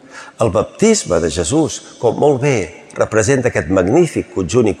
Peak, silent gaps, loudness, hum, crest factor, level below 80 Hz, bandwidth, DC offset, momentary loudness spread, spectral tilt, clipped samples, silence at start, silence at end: -2 dBFS; none; -15 LUFS; none; 14 dB; -44 dBFS; 12.5 kHz; under 0.1%; 7 LU; -5 dB/octave; under 0.1%; 0.1 s; 0.05 s